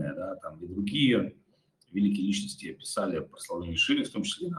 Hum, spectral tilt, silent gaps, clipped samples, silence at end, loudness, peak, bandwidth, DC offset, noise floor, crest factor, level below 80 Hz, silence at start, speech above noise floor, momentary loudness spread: none; -4.5 dB/octave; none; under 0.1%; 0 s; -30 LUFS; -14 dBFS; 12.5 kHz; under 0.1%; -68 dBFS; 16 dB; -64 dBFS; 0 s; 39 dB; 13 LU